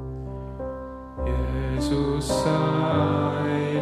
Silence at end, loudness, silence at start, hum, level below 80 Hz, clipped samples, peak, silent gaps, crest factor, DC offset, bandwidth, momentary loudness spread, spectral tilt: 0 s; -25 LUFS; 0 s; none; -34 dBFS; under 0.1%; -10 dBFS; none; 16 dB; under 0.1%; 15 kHz; 13 LU; -6.5 dB/octave